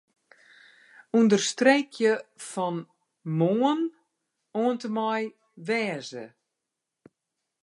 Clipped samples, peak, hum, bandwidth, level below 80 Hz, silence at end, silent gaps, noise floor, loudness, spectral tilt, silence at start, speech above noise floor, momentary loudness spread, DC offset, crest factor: under 0.1%; -6 dBFS; none; 11.5 kHz; -84 dBFS; 1.35 s; none; -85 dBFS; -26 LUFS; -5 dB/octave; 1.15 s; 60 dB; 16 LU; under 0.1%; 22 dB